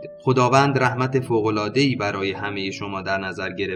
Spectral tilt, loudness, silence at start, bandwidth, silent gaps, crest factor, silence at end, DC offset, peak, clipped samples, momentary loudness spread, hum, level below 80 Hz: -6 dB/octave; -21 LUFS; 0 s; 11 kHz; none; 18 dB; 0 s; under 0.1%; -4 dBFS; under 0.1%; 10 LU; none; -60 dBFS